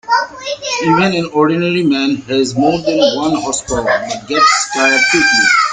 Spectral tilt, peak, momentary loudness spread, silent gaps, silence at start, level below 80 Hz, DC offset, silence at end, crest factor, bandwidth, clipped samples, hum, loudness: -3.5 dB/octave; 0 dBFS; 8 LU; none; 0.05 s; -44 dBFS; under 0.1%; 0 s; 14 dB; 9.6 kHz; under 0.1%; none; -13 LUFS